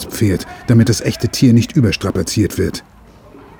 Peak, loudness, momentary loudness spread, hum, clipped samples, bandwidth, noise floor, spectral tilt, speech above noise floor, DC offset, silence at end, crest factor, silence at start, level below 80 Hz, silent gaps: 0 dBFS; -15 LUFS; 9 LU; none; under 0.1%; 20 kHz; -41 dBFS; -6 dB/octave; 27 dB; under 0.1%; 0.2 s; 14 dB; 0 s; -38 dBFS; none